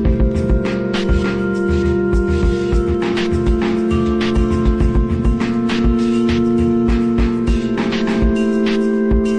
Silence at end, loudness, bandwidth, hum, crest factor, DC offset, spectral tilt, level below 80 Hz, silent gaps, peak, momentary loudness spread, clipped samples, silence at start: 0 s; -17 LUFS; 9.6 kHz; none; 12 dB; under 0.1%; -7.5 dB/octave; -20 dBFS; none; -4 dBFS; 2 LU; under 0.1%; 0 s